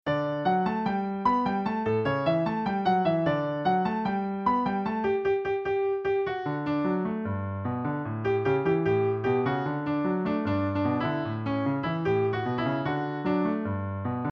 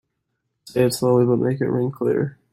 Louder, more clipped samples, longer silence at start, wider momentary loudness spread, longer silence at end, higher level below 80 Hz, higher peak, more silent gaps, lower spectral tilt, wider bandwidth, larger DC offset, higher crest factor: second, -27 LUFS vs -20 LUFS; neither; second, 0.05 s vs 0.65 s; about the same, 5 LU vs 6 LU; second, 0 s vs 0.2 s; about the same, -58 dBFS vs -60 dBFS; second, -12 dBFS vs -6 dBFS; neither; first, -9 dB/octave vs -7 dB/octave; second, 6.4 kHz vs 16 kHz; neither; about the same, 16 dB vs 14 dB